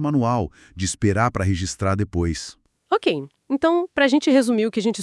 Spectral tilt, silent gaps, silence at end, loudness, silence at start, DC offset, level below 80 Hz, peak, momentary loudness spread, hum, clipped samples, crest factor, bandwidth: -5.5 dB/octave; none; 0 s; -21 LUFS; 0 s; under 0.1%; -46 dBFS; -6 dBFS; 10 LU; none; under 0.1%; 16 dB; 12 kHz